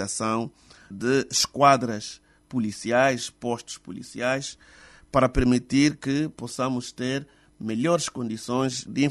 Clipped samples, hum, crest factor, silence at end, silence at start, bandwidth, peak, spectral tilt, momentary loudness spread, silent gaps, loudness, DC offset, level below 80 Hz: under 0.1%; none; 20 dB; 0 s; 0 s; 12.5 kHz; -6 dBFS; -4.5 dB/octave; 13 LU; none; -25 LUFS; under 0.1%; -44 dBFS